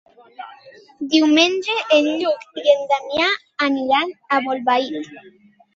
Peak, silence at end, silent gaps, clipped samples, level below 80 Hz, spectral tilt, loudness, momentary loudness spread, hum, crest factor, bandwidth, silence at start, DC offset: -2 dBFS; 0.45 s; none; under 0.1%; -64 dBFS; -2.5 dB/octave; -18 LUFS; 18 LU; none; 18 dB; 7.8 kHz; 0.4 s; under 0.1%